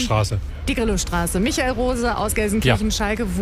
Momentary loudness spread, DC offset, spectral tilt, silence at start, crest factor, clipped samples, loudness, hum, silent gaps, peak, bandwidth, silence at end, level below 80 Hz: 4 LU; under 0.1%; -4.5 dB/octave; 0 s; 16 dB; under 0.1%; -21 LUFS; none; none; -4 dBFS; 16 kHz; 0 s; -28 dBFS